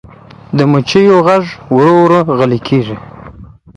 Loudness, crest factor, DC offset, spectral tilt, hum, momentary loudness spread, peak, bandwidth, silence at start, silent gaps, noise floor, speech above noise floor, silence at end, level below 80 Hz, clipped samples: -10 LUFS; 10 dB; under 0.1%; -7.5 dB/octave; none; 8 LU; 0 dBFS; 10.5 kHz; 0.5 s; none; -35 dBFS; 26 dB; 0.3 s; -44 dBFS; under 0.1%